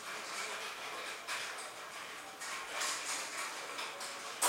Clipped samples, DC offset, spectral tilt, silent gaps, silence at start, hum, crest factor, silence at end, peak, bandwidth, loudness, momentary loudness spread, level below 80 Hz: under 0.1%; under 0.1%; 1 dB/octave; none; 0 s; none; 26 dB; 0 s; -16 dBFS; 16 kHz; -40 LUFS; 8 LU; -84 dBFS